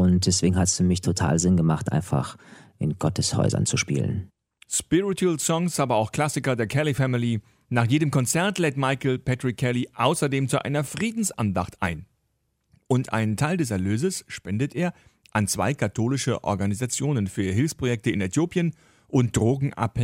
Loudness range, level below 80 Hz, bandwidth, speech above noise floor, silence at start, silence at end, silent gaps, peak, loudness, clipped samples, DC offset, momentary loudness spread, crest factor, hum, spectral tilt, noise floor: 3 LU; -50 dBFS; 16 kHz; 49 dB; 0 s; 0 s; none; -6 dBFS; -24 LUFS; under 0.1%; under 0.1%; 7 LU; 18 dB; none; -5 dB/octave; -73 dBFS